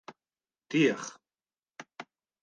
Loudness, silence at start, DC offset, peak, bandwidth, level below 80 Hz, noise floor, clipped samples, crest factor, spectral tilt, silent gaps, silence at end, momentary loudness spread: -29 LUFS; 0.1 s; under 0.1%; -14 dBFS; 9.8 kHz; -86 dBFS; under -90 dBFS; under 0.1%; 20 dB; -5 dB/octave; none; 0.4 s; 25 LU